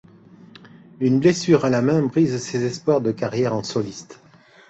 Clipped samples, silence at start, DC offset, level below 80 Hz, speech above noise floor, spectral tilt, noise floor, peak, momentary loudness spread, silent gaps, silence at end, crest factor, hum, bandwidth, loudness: under 0.1%; 0.65 s; under 0.1%; -58 dBFS; 27 dB; -6.5 dB/octave; -47 dBFS; -4 dBFS; 9 LU; none; 0.55 s; 18 dB; none; 8.2 kHz; -20 LUFS